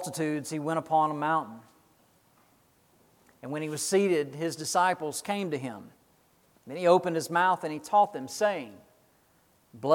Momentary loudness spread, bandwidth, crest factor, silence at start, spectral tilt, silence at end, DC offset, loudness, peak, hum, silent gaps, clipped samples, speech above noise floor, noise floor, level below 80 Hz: 13 LU; 18 kHz; 22 dB; 0 s; -4.5 dB/octave; 0 s; under 0.1%; -28 LUFS; -8 dBFS; none; none; under 0.1%; 37 dB; -65 dBFS; -78 dBFS